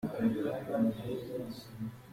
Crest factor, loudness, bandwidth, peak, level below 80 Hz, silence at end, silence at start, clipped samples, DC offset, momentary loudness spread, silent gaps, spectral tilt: 16 dB; -36 LUFS; 16 kHz; -18 dBFS; -64 dBFS; 0 s; 0 s; under 0.1%; under 0.1%; 11 LU; none; -7.5 dB/octave